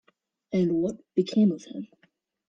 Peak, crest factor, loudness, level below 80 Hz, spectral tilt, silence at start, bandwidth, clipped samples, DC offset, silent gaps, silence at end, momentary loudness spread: -12 dBFS; 16 dB; -26 LUFS; -68 dBFS; -8 dB/octave; 0.5 s; 7.8 kHz; under 0.1%; under 0.1%; none; 0.65 s; 17 LU